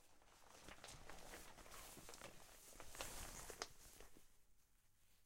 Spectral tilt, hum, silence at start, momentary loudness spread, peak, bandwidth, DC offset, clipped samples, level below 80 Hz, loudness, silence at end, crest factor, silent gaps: -2 dB/octave; none; 0 s; 11 LU; -28 dBFS; 16 kHz; under 0.1%; under 0.1%; -66 dBFS; -57 LUFS; 0 s; 32 dB; none